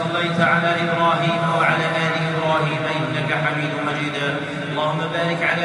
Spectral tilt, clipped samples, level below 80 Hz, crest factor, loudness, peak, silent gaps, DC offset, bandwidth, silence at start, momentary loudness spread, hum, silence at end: -6 dB/octave; under 0.1%; -60 dBFS; 16 dB; -20 LUFS; -4 dBFS; none; under 0.1%; 11 kHz; 0 s; 5 LU; none; 0 s